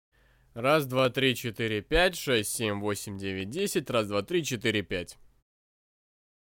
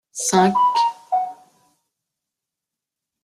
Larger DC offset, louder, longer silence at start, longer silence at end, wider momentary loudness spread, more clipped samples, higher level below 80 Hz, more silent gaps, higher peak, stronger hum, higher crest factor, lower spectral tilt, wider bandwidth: neither; second, -28 LUFS vs -19 LUFS; first, 0.55 s vs 0.15 s; second, 1.3 s vs 1.9 s; about the same, 10 LU vs 8 LU; neither; first, -48 dBFS vs -64 dBFS; neither; second, -10 dBFS vs -4 dBFS; neither; about the same, 20 dB vs 20 dB; about the same, -4 dB/octave vs -4 dB/octave; first, 17 kHz vs 13.5 kHz